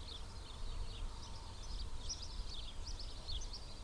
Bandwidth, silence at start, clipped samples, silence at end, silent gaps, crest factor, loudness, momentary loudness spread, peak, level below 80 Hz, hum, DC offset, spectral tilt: 10.5 kHz; 0 s; under 0.1%; 0 s; none; 12 dB; -48 LUFS; 5 LU; -32 dBFS; -46 dBFS; none; under 0.1%; -3 dB/octave